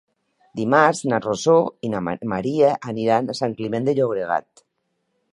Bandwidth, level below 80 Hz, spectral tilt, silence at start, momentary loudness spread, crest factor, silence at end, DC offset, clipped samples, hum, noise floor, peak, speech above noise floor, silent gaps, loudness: 11.5 kHz; -60 dBFS; -5.5 dB/octave; 0.55 s; 9 LU; 20 dB; 0.9 s; under 0.1%; under 0.1%; none; -73 dBFS; 0 dBFS; 53 dB; none; -21 LUFS